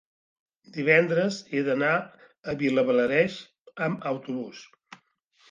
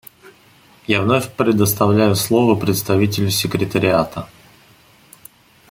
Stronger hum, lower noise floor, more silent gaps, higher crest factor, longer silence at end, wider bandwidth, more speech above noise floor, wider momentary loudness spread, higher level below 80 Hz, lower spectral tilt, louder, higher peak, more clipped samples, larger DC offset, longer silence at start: neither; first, -64 dBFS vs -50 dBFS; first, 2.38-2.43 s, 3.60-3.65 s vs none; about the same, 20 dB vs 18 dB; second, 0.85 s vs 1.45 s; second, 7.6 kHz vs 17 kHz; first, 39 dB vs 34 dB; first, 19 LU vs 7 LU; second, -70 dBFS vs -52 dBFS; about the same, -6 dB/octave vs -5 dB/octave; second, -25 LUFS vs -17 LUFS; second, -8 dBFS vs -2 dBFS; neither; neither; second, 0.75 s vs 0.9 s